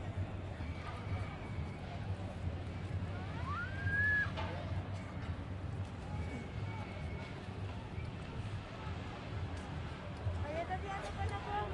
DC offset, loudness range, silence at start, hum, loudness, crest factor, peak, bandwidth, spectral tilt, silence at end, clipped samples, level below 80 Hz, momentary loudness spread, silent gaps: under 0.1%; 6 LU; 0 s; none; -41 LUFS; 16 dB; -24 dBFS; 11 kHz; -6.5 dB/octave; 0 s; under 0.1%; -52 dBFS; 7 LU; none